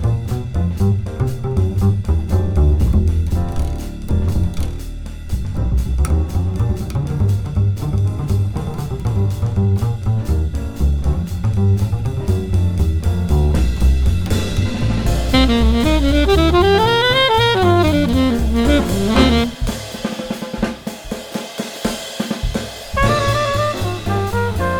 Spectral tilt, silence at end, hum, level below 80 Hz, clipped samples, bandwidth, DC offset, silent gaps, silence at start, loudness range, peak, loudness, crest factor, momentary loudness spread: -6 dB/octave; 0 s; none; -22 dBFS; under 0.1%; 17.5 kHz; under 0.1%; none; 0 s; 7 LU; -2 dBFS; -18 LUFS; 14 dB; 11 LU